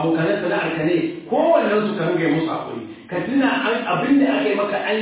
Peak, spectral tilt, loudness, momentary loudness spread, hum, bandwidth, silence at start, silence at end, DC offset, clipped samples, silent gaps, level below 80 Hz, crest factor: -4 dBFS; -10 dB/octave; -20 LUFS; 9 LU; none; 4 kHz; 0 s; 0 s; under 0.1%; under 0.1%; none; -60 dBFS; 14 dB